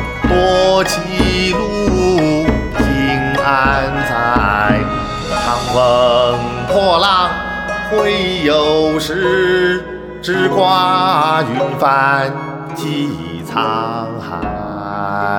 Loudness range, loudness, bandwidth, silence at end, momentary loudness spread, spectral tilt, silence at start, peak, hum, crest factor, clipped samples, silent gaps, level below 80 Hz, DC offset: 2 LU; -14 LUFS; 18.5 kHz; 0 s; 10 LU; -5 dB/octave; 0 s; 0 dBFS; none; 14 dB; under 0.1%; none; -30 dBFS; under 0.1%